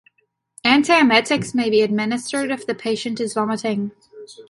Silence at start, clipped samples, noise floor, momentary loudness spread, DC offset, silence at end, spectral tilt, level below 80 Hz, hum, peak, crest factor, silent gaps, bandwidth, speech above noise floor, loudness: 0.65 s; under 0.1%; -67 dBFS; 11 LU; under 0.1%; 0.1 s; -4 dB/octave; -62 dBFS; none; -2 dBFS; 18 dB; none; 11.5 kHz; 48 dB; -19 LUFS